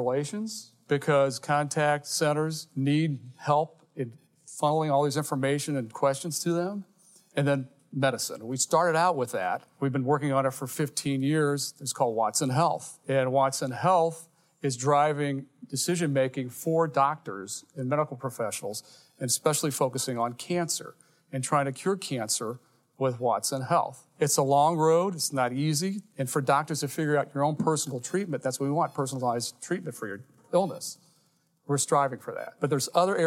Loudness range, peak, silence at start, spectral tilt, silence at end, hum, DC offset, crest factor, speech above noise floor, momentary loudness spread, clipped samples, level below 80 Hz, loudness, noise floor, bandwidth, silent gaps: 4 LU; -8 dBFS; 0 s; -4.5 dB/octave; 0 s; none; under 0.1%; 20 dB; 41 dB; 12 LU; under 0.1%; -78 dBFS; -28 LUFS; -68 dBFS; 16.5 kHz; none